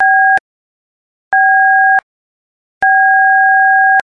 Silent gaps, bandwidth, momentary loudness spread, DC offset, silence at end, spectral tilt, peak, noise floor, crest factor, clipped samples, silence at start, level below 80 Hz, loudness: 0.40-1.31 s, 2.03-2.81 s; 4 kHz; 7 LU; under 0.1%; 0 s; -2 dB/octave; -2 dBFS; under -90 dBFS; 10 dB; under 0.1%; 0 s; -62 dBFS; -9 LUFS